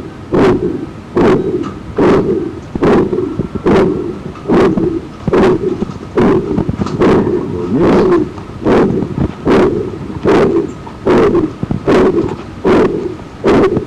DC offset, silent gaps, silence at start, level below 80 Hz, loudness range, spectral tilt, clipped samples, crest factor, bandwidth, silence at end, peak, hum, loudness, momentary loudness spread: under 0.1%; none; 0 s; -32 dBFS; 1 LU; -8 dB/octave; under 0.1%; 6 dB; 10 kHz; 0 s; -6 dBFS; none; -13 LUFS; 10 LU